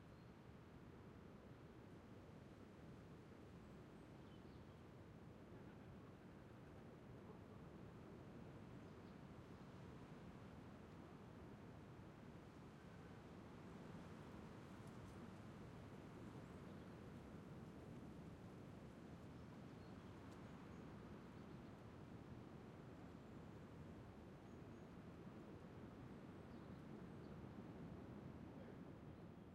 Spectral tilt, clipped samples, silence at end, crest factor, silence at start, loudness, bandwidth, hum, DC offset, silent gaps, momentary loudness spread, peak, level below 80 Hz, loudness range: -7 dB/octave; under 0.1%; 0 s; 14 dB; 0 s; -60 LUFS; 13 kHz; none; under 0.1%; none; 4 LU; -44 dBFS; -74 dBFS; 3 LU